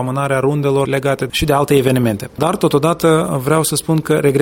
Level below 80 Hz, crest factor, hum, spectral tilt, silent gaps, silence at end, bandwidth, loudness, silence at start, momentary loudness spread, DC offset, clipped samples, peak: -40 dBFS; 14 dB; none; -5.5 dB/octave; none; 0 s; 17 kHz; -15 LUFS; 0 s; 4 LU; under 0.1%; under 0.1%; 0 dBFS